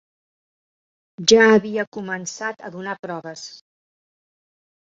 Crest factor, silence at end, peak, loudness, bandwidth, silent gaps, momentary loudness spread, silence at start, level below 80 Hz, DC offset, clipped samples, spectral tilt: 22 dB; 1.3 s; -2 dBFS; -19 LUFS; 7.8 kHz; 1.87-1.92 s, 2.99-3.03 s; 20 LU; 1.2 s; -64 dBFS; under 0.1%; under 0.1%; -3.5 dB/octave